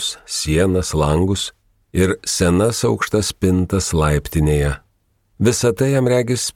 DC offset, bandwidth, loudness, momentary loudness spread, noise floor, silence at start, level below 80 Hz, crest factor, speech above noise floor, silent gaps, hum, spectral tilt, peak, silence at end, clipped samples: under 0.1%; 17.5 kHz; -18 LUFS; 6 LU; -62 dBFS; 0 s; -32 dBFS; 14 dB; 46 dB; none; none; -5 dB/octave; -2 dBFS; 0.05 s; under 0.1%